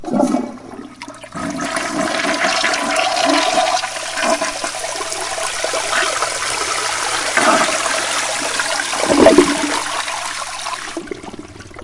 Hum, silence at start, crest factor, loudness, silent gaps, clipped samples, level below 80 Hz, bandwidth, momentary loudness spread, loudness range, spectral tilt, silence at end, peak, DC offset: none; 0 s; 18 dB; -17 LUFS; none; under 0.1%; -48 dBFS; 11.5 kHz; 16 LU; 4 LU; -2 dB/octave; 0 s; 0 dBFS; under 0.1%